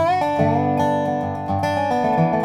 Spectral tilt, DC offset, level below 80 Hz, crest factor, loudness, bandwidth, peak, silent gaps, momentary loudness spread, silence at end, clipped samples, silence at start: -7.5 dB/octave; under 0.1%; -56 dBFS; 14 dB; -20 LUFS; 13.5 kHz; -6 dBFS; none; 4 LU; 0 s; under 0.1%; 0 s